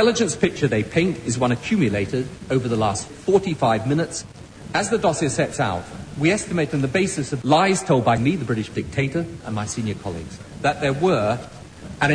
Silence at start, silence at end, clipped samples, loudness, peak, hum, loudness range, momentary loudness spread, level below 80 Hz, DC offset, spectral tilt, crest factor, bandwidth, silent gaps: 0 s; 0 s; under 0.1%; -22 LUFS; -4 dBFS; none; 3 LU; 11 LU; -46 dBFS; under 0.1%; -5.5 dB/octave; 18 dB; 10.5 kHz; none